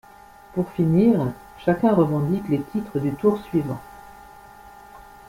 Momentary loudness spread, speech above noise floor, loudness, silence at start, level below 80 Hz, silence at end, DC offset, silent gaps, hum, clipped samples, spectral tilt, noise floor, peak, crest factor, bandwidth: 12 LU; 26 dB; -22 LUFS; 0.55 s; -52 dBFS; 0.25 s; under 0.1%; none; none; under 0.1%; -9 dB/octave; -47 dBFS; -6 dBFS; 18 dB; 16.5 kHz